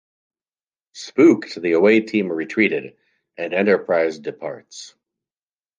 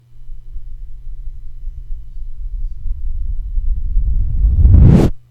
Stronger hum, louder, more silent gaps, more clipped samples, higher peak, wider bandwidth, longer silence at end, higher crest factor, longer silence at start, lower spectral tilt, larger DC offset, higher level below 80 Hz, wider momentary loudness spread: neither; second, -18 LUFS vs -15 LUFS; neither; neither; about the same, -2 dBFS vs 0 dBFS; first, 7.6 kHz vs 5.2 kHz; first, 0.9 s vs 0.1 s; about the same, 18 dB vs 14 dB; first, 0.95 s vs 0.1 s; second, -6 dB/octave vs -10 dB/octave; neither; second, -72 dBFS vs -16 dBFS; second, 18 LU vs 27 LU